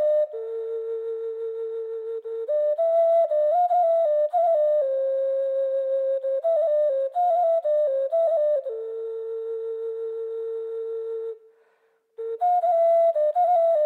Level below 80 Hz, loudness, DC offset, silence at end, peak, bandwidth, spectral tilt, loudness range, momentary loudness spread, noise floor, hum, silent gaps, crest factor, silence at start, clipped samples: under -90 dBFS; -24 LUFS; under 0.1%; 0 s; -14 dBFS; 4.2 kHz; -2 dB/octave; 8 LU; 11 LU; -66 dBFS; none; none; 10 dB; 0 s; under 0.1%